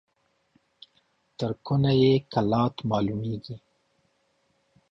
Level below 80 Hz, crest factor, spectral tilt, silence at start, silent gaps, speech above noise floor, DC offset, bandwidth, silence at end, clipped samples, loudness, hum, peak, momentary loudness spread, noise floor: -56 dBFS; 18 dB; -8.5 dB/octave; 1.4 s; none; 46 dB; under 0.1%; 7.2 kHz; 1.35 s; under 0.1%; -25 LUFS; none; -10 dBFS; 15 LU; -70 dBFS